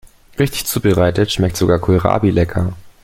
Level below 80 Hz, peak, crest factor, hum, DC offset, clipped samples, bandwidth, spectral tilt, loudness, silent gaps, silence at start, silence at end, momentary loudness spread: -36 dBFS; 0 dBFS; 14 dB; none; under 0.1%; under 0.1%; 16.5 kHz; -6 dB/octave; -16 LUFS; none; 0.4 s; 0.15 s; 7 LU